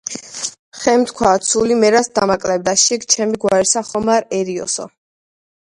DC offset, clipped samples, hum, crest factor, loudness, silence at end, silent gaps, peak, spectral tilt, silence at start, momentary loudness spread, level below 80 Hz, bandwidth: under 0.1%; under 0.1%; none; 16 dB; -16 LUFS; 0.9 s; 0.59-0.72 s; 0 dBFS; -2.5 dB/octave; 0.05 s; 11 LU; -50 dBFS; 11.5 kHz